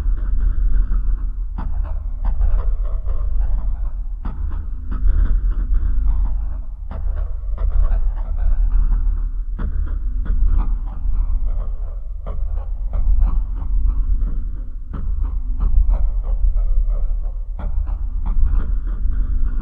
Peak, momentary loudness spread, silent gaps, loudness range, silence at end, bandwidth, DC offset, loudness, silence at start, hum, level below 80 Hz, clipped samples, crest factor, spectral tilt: -2 dBFS; 8 LU; none; 2 LU; 0 s; 1.8 kHz; 0.4%; -25 LUFS; 0 s; none; -18 dBFS; under 0.1%; 14 dB; -11 dB/octave